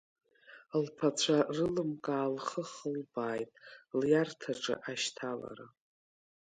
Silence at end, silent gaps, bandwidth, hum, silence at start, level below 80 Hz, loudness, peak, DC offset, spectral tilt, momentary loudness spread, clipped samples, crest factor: 0.9 s; none; 9.4 kHz; none; 0.5 s; -72 dBFS; -34 LUFS; -16 dBFS; under 0.1%; -4.5 dB/octave; 11 LU; under 0.1%; 20 dB